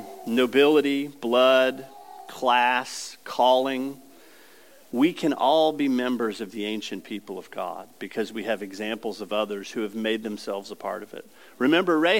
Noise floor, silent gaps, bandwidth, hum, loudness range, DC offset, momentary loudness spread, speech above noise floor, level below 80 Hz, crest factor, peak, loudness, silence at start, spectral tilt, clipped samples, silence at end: -53 dBFS; none; 17 kHz; none; 9 LU; 0.2%; 16 LU; 29 dB; -82 dBFS; 18 dB; -6 dBFS; -24 LUFS; 0 s; -4 dB/octave; under 0.1%; 0 s